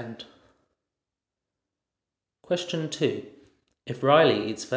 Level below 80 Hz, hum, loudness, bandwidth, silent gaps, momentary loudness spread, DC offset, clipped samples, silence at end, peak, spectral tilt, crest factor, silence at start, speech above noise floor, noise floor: -70 dBFS; none; -24 LUFS; 8 kHz; none; 23 LU; under 0.1%; under 0.1%; 0 s; -6 dBFS; -5 dB/octave; 22 dB; 0 s; 63 dB; -88 dBFS